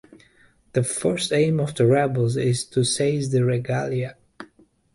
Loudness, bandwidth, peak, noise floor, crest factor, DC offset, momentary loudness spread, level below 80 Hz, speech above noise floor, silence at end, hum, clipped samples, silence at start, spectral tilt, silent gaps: -22 LUFS; 11.5 kHz; -6 dBFS; -57 dBFS; 16 dB; under 0.1%; 7 LU; -58 dBFS; 36 dB; 0.5 s; none; under 0.1%; 0.75 s; -5.5 dB/octave; none